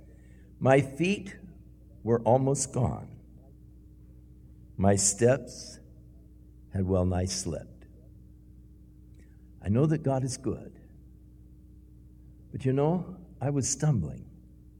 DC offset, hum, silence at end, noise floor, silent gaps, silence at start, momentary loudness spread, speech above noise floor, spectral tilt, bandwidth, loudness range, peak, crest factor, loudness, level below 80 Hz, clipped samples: under 0.1%; none; 0.5 s; -52 dBFS; none; 0.6 s; 20 LU; 25 dB; -5.5 dB/octave; 15.5 kHz; 6 LU; -6 dBFS; 24 dB; -28 LUFS; -52 dBFS; under 0.1%